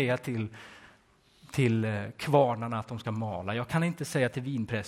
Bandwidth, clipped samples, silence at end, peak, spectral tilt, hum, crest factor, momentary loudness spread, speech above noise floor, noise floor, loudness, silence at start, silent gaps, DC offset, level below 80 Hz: 16 kHz; under 0.1%; 0 s; -10 dBFS; -6.5 dB/octave; none; 22 dB; 11 LU; 33 dB; -63 dBFS; -30 LUFS; 0 s; none; under 0.1%; -60 dBFS